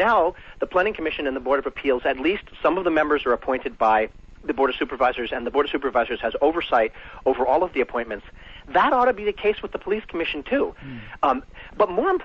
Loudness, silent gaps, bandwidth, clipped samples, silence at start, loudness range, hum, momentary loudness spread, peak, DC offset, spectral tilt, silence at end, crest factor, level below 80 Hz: -23 LUFS; none; 6.8 kHz; under 0.1%; 0 s; 1 LU; none; 8 LU; -8 dBFS; under 0.1%; -6.5 dB/octave; 0 s; 16 dB; -46 dBFS